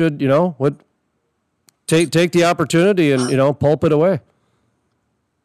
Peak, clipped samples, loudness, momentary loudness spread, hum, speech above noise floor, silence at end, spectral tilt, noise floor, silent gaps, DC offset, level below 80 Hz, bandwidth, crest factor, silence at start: -2 dBFS; under 0.1%; -16 LUFS; 6 LU; none; 54 dB; 1.25 s; -6 dB/octave; -69 dBFS; none; under 0.1%; -56 dBFS; 14 kHz; 14 dB; 0 s